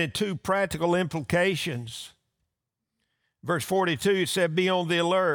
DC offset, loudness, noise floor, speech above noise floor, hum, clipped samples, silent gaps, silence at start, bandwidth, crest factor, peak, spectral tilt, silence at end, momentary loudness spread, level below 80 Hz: under 0.1%; -26 LUFS; -84 dBFS; 59 dB; none; under 0.1%; none; 0 s; over 20 kHz; 14 dB; -12 dBFS; -4.5 dB/octave; 0 s; 11 LU; -60 dBFS